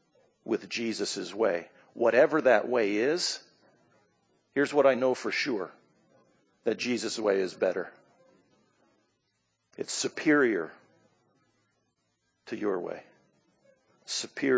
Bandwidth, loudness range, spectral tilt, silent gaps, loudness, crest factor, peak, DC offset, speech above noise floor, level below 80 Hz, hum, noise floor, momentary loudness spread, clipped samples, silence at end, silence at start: 8 kHz; 7 LU; -3.5 dB/octave; none; -28 LUFS; 20 dB; -10 dBFS; under 0.1%; 49 dB; -82 dBFS; none; -77 dBFS; 16 LU; under 0.1%; 0 s; 0.45 s